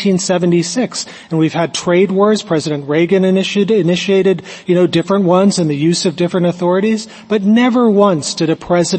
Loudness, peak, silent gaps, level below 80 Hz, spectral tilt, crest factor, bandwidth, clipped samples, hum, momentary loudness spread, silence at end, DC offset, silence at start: -14 LUFS; 0 dBFS; none; -54 dBFS; -5.5 dB/octave; 12 dB; 8.8 kHz; under 0.1%; none; 6 LU; 0 s; under 0.1%; 0 s